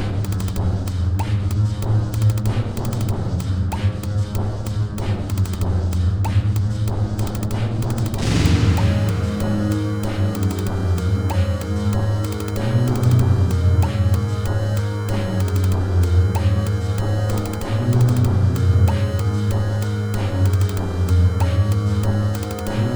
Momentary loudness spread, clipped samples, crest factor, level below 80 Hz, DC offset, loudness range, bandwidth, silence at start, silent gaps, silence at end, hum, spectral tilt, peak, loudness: 6 LU; under 0.1%; 14 dB; -30 dBFS; 0.1%; 3 LU; over 20 kHz; 0 s; none; 0 s; none; -7 dB/octave; -4 dBFS; -20 LUFS